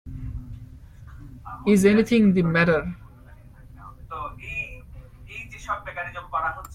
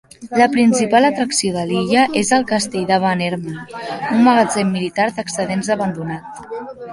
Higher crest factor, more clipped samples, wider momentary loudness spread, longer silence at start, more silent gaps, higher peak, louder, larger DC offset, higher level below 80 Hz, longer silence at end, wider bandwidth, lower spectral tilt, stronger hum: about the same, 20 dB vs 16 dB; neither; first, 25 LU vs 15 LU; second, 0.05 s vs 0.2 s; neither; second, -6 dBFS vs -2 dBFS; second, -22 LUFS vs -16 LUFS; neither; first, -44 dBFS vs -54 dBFS; about the same, 0 s vs 0 s; first, 15 kHz vs 11.5 kHz; first, -6.5 dB/octave vs -4.5 dB/octave; neither